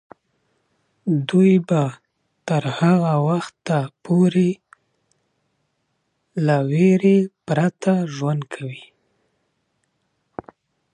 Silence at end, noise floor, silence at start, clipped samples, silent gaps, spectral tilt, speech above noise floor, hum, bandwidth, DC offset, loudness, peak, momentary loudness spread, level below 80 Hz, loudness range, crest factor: 2.15 s; -71 dBFS; 1.05 s; under 0.1%; none; -8 dB/octave; 53 dB; none; 9.8 kHz; under 0.1%; -19 LUFS; -4 dBFS; 18 LU; -66 dBFS; 4 LU; 18 dB